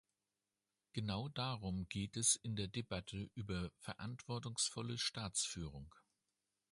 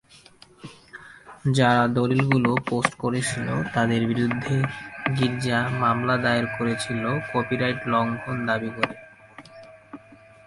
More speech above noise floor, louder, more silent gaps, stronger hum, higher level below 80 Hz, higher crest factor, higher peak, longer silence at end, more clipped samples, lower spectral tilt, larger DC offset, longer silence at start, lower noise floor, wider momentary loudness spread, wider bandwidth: first, over 47 dB vs 28 dB; second, -42 LUFS vs -24 LUFS; neither; neither; second, -62 dBFS vs -56 dBFS; about the same, 24 dB vs 22 dB; second, -22 dBFS vs -2 dBFS; first, 0.75 s vs 0.3 s; neither; second, -3 dB/octave vs -6 dB/octave; neither; first, 0.95 s vs 0.65 s; first, under -90 dBFS vs -51 dBFS; second, 13 LU vs 22 LU; about the same, 11.5 kHz vs 11.5 kHz